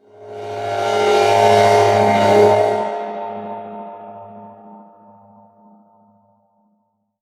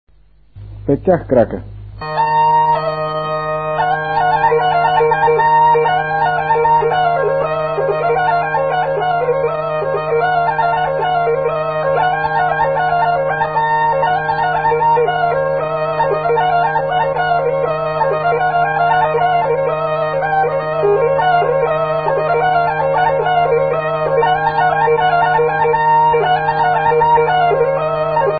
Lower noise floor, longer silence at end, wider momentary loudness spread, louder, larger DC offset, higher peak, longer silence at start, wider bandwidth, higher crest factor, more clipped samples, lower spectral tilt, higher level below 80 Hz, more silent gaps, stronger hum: first, -66 dBFS vs -47 dBFS; first, 2.45 s vs 0 s; first, 23 LU vs 5 LU; about the same, -15 LUFS vs -15 LUFS; second, under 0.1% vs 0.4%; about the same, 0 dBFS vs 0 dBFS; second, 0.2 s vs 0.55 s; first, 14.5 kHz vs 4.9 kHz; about the same, 18 dB vs 14 dB; neither; second, -5 dB/octave vs -10.5 dB/octave; second, -64 dBFS vs -44 dBFS; neither; neither